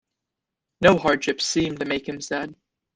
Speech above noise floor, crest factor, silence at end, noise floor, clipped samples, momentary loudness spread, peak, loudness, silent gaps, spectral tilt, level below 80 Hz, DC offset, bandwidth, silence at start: 62 dB; 22 dB; 0.45 s; -85 dBFS; under 0.1%; 11 LU; -2 dBFS; -22 LUFS; none; -4 dB/octave; -54 dBFS; under 0.1%; 10 kHz; 0.8 s